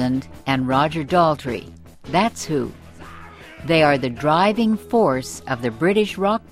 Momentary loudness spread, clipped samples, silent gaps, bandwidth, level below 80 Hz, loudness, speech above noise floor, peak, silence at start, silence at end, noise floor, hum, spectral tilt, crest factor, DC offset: 15 LU; under 0.1%; none; 15.5 kHz; -48 dBFS; -20 LUFS; 20 dB; -4 dBFS; 0 s; 0.15 s; -40 dBFS; none; -5.5 dB/octave; 16 dB; under 0.1%